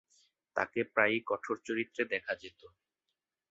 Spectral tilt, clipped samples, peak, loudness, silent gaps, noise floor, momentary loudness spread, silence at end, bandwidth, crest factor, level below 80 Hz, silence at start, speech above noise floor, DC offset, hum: -2 dB/octave; under 0.1%; -10 dBFS; -34 LUFS; none; -88 dBFS; 11 LU; 0.85 s; 7.8 kHz; 26 dB; -76 dBFS; 0.55 s; 53 dB; under 0.1%; none